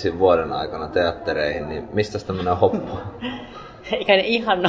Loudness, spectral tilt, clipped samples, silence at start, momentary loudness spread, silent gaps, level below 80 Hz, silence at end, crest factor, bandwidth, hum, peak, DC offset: -22 LUFS; -6 dB/octave; under 0.1%; 0 s; 13 LU; none; -44 dBFS; 0 s; 20 dB; 7.8 kHz; none; -2 dBFS; under 0.1%